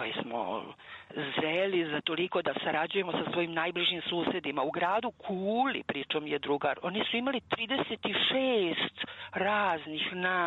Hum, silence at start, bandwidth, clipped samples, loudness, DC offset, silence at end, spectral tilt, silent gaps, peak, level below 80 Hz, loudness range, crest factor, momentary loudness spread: none; 0 s; 7.8 kHz; under 0.1%; -31 LUFS; under 0.1%; 0 s; -6.5 dB/octave; none; -14 dBFS; -70 dBFS; 1 LU; 16 dB; 7 LU